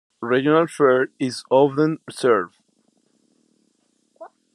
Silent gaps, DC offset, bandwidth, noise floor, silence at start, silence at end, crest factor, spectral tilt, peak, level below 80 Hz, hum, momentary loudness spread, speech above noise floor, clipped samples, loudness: none; under 0.1%; 12.5 kHz; -66 dBFS; 0.2 s; 0.3 s; 18 dB; -6 dB/octave; -4 dBFS; -72 dBFS; none; 7 LU; 47 dB; under 0.1%; -19 LUFS